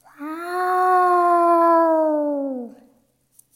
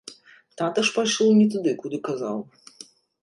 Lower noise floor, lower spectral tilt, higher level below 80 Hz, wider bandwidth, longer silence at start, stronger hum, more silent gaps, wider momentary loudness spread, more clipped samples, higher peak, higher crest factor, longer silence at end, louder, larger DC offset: first, -62 dBFS vs -47 dBFS; about the same, -4.5 dB/octave vs -4.5 dB/octave; second, -80 dBFS vs -72 dBFS; first, 16 kHz vs 11.5 kHz; first, 0.2 s vs 0.05 s; neither; neither; second, 16 LU vs 25 LU; neither; about the same, -8 dBFS vs -10 dBFS; about the same, 12 dB vs 14 dB; about the same, 0.85 s vs 0.8 s; first, -18 LUFS vs -23 LUFS; neither